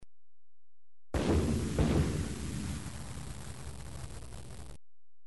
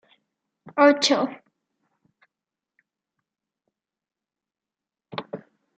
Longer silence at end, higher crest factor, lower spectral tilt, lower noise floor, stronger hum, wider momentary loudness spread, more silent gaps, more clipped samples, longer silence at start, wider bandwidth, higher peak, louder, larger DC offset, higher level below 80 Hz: second, 0 s vs 0.4 s; second, 18 dB vs 26 dB; first, -6 dB/octave vs -1.5 dB/octave; about the same, under -90 dBFS vs -90 dBFS; neither; second, 18 LU vs 22 LU; neither; neither; second, 0 s vs 0.75 s; first, 11.5 kHz vs 7.6 kHz; second, -18 dBFS vs -2 dBFS; second, -35 LUFS vs -20 LUFS; first, 0.5% vs under 0.1%; first, -42 dBFS vs -80 dBFS